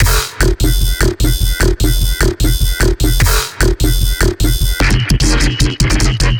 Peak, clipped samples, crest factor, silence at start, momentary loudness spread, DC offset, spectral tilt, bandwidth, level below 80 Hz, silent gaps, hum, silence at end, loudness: 0 dBFS; under 0.1%; 12 dB; 0 s; 2 LU; under 0.1%; -4 dB/octave; over 20 kHz; -14 dBFS; none; none; 0 s; -14 LUFS